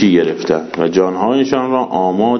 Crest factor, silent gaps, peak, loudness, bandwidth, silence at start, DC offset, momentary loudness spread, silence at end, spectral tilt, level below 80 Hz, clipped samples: 14 dB; none; 0 dBFS; -15 LUFS; 6.4 kHz; 0 s; under 0.1%; 3 LU; 0 s; -6.5 dB/octave; -52 dBFS; under 0.1%